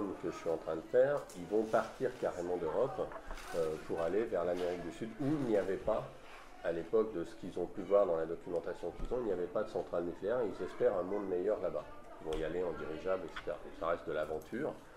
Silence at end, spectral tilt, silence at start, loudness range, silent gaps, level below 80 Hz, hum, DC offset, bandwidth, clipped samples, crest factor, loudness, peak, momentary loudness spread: 0 s; -6.5 dB/octave; 0 s; 2 LU; none; -56 dBFS; none; under 0.1%; 14 kHz; under 0.1%; 18 dB; -37 LUFS; -18 dBFS; 10 LU